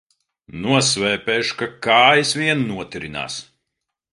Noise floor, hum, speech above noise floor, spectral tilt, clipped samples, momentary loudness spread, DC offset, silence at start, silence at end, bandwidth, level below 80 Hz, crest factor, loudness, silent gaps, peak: -80 dBFS; none; 61 dB; -3 dB/octave; under 0.1%; 16 LU; under 0.1%; 0.55 s; 0.7 s; 11.5 kHz; -54 dBFS; 20 dB; -18 LUFS; none; 0 dBFS